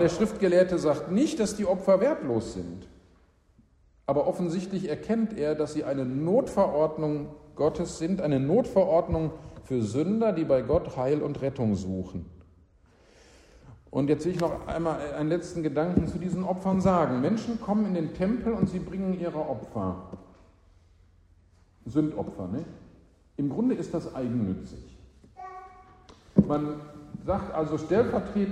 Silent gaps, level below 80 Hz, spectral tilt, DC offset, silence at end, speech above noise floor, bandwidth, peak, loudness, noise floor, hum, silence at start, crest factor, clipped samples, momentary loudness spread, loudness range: none; -50 dBFS; -7.5 dB/octave; under 0.1%; 0 s; 35 dB; 12 kHz; -8 dBFS; -28 LUFS; -61 dBFS; none; 0 s; 20 dB; under 0.1%; 14 LU; 7 LU